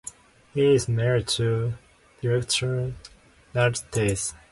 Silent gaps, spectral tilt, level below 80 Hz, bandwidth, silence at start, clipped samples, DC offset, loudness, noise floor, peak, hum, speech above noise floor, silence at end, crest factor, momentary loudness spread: none; -4.5 dB/octave; -48 dBFS; 11.5 kHz; 0.05 s; under 0.1%; under 0.1%; -25 LUFS; -45 dBFS; -10 dBFS; none; 21 dB; 0.15 s; 16 dB; 12 LU